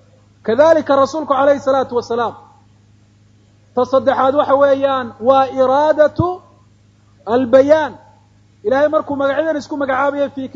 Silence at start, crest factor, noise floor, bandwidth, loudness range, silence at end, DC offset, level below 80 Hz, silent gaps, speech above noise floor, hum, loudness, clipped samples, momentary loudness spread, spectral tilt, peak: 0.45 s; 16 dB; -50 dBFS; 7.6 kHz; 3 LU; 0.1 s; under 0.1%; -52 dBFS; none; 36 dB; none; -15 LUFS; under 0.1%; 9 LU; -6 dB/octave; 0 dBFS